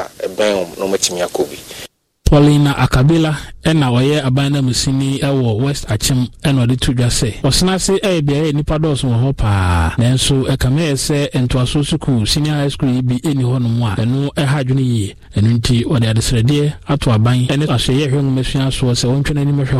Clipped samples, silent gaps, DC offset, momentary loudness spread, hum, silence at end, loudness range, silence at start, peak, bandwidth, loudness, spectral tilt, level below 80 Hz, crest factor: under 0.1%; none; under 0.1%; 5 LU; none; 0 s; 2 LU; 0 s; 0 dBFS; 15 kHz; -15 LUFS; -5.5 dB/octave; -28 dBFS; 14 dB